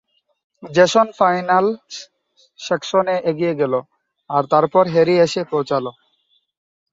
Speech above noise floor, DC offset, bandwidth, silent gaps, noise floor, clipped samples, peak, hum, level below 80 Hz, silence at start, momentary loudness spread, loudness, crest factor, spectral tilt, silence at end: 47 dB; under 0.1%; 7.8 kHz; none; -64 dBFS; under 0.1%; -2 dBFS; none; -64 dBFS; 0.6 s; 11 LU; -17 LUFS; 18 dB; -5 dB/octave; 1 s